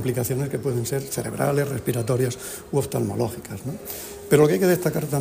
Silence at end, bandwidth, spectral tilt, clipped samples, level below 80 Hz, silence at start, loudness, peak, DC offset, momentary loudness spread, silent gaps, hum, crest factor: 0 s; 15.5 kHz; -6 dB/octave; under 0.1%; -52 dBFS; 0 s; -24 LUFS; -4 dBFS; under 0.1%; 14 LU; none; none; 18 dB